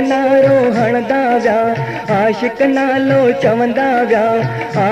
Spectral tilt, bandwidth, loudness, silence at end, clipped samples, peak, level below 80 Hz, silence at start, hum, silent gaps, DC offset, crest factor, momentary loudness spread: -7 dB/octave; 10.5 kHz; -13 LUFS; 0 s; under 0.1%; -2 dBFS; -50 dBFS; 0 s; none; none; under 0.1%; 12 dB; 6 LU